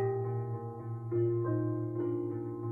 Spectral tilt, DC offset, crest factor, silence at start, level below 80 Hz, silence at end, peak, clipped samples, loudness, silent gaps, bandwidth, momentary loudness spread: -12.5 dB/octave; under 0.1%; 12 dB; 0 s; -68 dBFS; 0 s; -22 dBFS; under 0.1%; -35 LUFS; none; 2.4 kHz; 9 LU